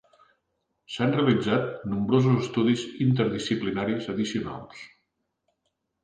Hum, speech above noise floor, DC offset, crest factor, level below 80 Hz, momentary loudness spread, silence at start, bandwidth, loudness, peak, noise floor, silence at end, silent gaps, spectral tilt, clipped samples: none; 53 dB; under 0.1%; 18 dB; -60 dBFS; 14 LU; 0.9 s; 9.4 kHz; -25 LUFS; -8 dBFS; -78 dBFS; 1.15 s; none; -6.5 dB/octave; under 0.1%